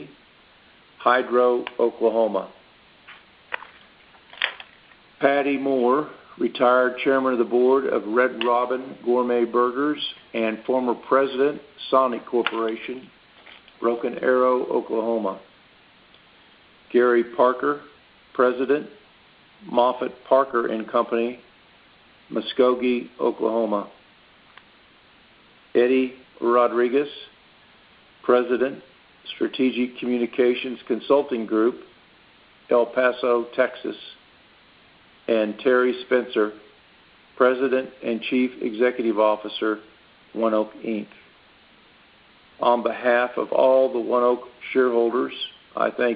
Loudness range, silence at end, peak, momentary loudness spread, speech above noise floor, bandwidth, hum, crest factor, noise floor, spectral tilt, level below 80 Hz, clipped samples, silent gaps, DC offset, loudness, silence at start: 4 LU; 0 s; -2 dBFS; 11 LU; 32 dB; 5 kHz; none; 22 dB; -54 dBFS; -2.5 dB/octave; -70 dBFS; under 0.1%; none; under 0.1%; -22 LUFS; 0 s